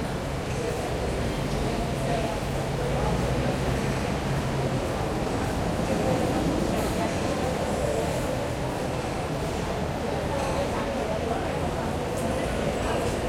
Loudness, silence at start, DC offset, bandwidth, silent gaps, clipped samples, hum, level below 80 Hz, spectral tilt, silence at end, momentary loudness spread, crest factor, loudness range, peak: -28 LUFS; 0 s; under 0.1%; 16.5 kHz; none; under 0.1%; none; -38 dBFS; -5.5 dB/octave; 0 s; 3 LU; 14 dB; 2 LU; -12 dBFS